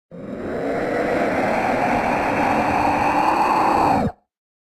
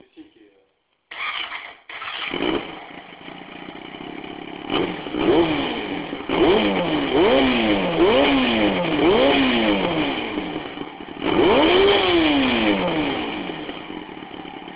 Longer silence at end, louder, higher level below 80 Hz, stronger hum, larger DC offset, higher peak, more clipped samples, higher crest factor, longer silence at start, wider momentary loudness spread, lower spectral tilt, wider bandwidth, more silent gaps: first, 0.5 s vs 0 s; about the same, -19 LUFS vs -19 LUFS; about the same, -44 dBFS vs -44 dBFS; neither; neither; about the same, -6 dBFS vs -4 dBFS; neither; about the same, 14 dB vs 16 dB; about the same, 0.1 s vs 0.2 s; second, 9 LU vs 19 LU; second, -6 dB/octave vs -9 dB/octave; first, 15.5 kHz vs 4 kHz; neither